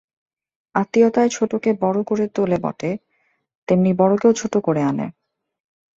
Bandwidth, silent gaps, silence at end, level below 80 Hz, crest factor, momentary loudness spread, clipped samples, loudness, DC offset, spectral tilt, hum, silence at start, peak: 7.8 kHz; 3.55-3.67 s; 0.85 s; -60 dBFS; 18 dB; 11 LU; under 0.1%; -19 LUFS; under 0.1%; -6.5 dB/octave; none; 0.75 s; -4 dBFS